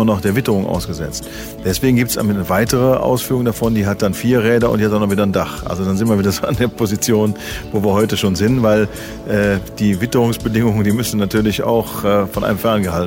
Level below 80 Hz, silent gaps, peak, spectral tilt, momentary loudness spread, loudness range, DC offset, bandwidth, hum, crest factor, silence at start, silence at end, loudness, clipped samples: -36 dBFS; none; -2 dBFS; -5.5 dB/octave; 7 LU; 1 LU; under 0.1%; 16.5 kHz; none; 14 dB; 0 s; 0 s; -16 LUFS; under 0.1%